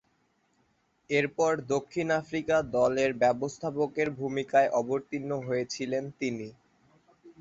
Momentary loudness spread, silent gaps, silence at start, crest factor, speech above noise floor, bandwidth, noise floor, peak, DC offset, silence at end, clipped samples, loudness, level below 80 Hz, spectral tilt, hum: 8 LU; none; 1.1 s; 18 dB; 43 dB; 8 kHz; -71 dBFS; -12 dBFS; under 0.1%; 0.1 s; under 0.1%; -29 LUFS; -64 dBFS; -5.5 dB/octave; none